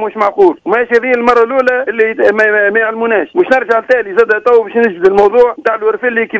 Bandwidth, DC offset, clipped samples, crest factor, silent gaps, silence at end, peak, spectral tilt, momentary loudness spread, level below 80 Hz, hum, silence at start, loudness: 8 kHz; under 0.1%; 1%; 10 dB; none; 0 s; 0 dBFS; -6 dB/octave; 4 LU; -50 dBFS; none; 0 s; -10 LUFS